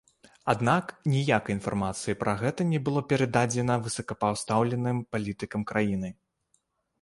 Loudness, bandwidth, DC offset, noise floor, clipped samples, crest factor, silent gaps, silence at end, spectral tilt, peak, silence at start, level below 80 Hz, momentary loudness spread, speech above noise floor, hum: -28 LUFS; 11.5 kHz; under 0.1%; -73 dBFS; under 0.1%; 22 dB; none; 0.9 s; -6 dB/octave; -8 dBFS; 0.45 s; -56 dBFS; 8 LU; 46 dB; none